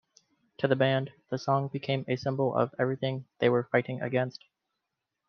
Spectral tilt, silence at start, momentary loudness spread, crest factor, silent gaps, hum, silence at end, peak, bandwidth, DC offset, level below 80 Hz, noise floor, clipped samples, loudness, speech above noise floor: -7.5 dB/octave; 0.6 s; 8 LU; 20 dB; none; none; 1 s; -10 dBFS; 6.6 kHz; under 0.1%; -74 dBFS; -85 dBFS; under 0.1%; -29 LUFS; 56 dB